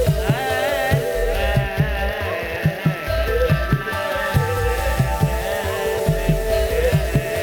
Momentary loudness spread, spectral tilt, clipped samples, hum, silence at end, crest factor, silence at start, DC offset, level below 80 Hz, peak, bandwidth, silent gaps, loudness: 4 LU; -6 dB/octave; under 0.1%; none; 0 s; 14 dB; 0 s; under 0.1%; -26 dBFS; -6 dBFS; over 20 kHz; none; -20 LUFS